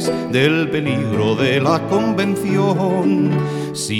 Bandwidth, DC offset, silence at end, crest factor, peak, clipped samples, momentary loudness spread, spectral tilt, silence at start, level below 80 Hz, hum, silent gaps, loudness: 16.5 kHz; under 0.1%; 0 s; 14 dB; -2 dBFS; under 0.1%; 4 LU; -6 dB/octave; 0 s; -52 dBFS; none; none; -17 LUFS